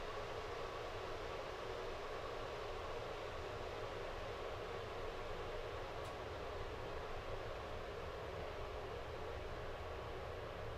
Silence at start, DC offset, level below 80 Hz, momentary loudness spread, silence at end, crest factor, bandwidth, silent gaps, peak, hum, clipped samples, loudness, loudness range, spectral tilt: 0 s; under 0.1%; -54 dBFS; 1 LU; 0 s; 14 dB; 13.5 kHz; none; -32 dBFS; none; under 0.1%; -47 LUFS; 1 LU; -5 dB/octave